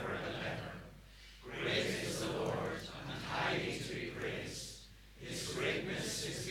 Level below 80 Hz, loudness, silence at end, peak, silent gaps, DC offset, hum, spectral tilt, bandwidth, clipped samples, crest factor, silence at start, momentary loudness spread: -60 dBFS; -39 LUFS; 0 s; -22 dBFS; none; under 0.1%; none; -3.5 dB/octave; 19 kHz; under 0.1%; 18 dB; 0 s; 16 LU